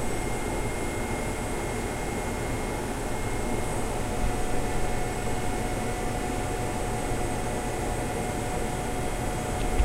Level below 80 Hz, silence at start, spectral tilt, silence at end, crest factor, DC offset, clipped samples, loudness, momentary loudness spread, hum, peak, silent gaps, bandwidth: -34 dBFS; 0 s; -5 dB/octave; 0 s; 16 dB; under 0.1%; under 0.1%; -30 LUFS; 1 LU; none; -12 dBFS; none; 16 kHz